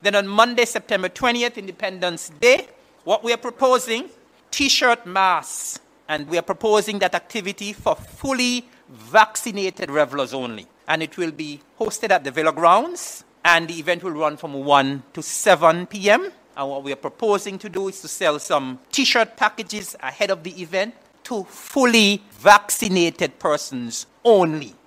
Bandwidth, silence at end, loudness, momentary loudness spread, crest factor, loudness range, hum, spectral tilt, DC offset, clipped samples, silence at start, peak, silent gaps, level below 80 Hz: 16 kHz; 0.15 s; -20 LUFS; 13 LU; 20 dB; 4 LU; none; -3 dB/octave; under 0.1%; under 0.1%; 0.05 s; 0 dBFS; none; -58 dBFS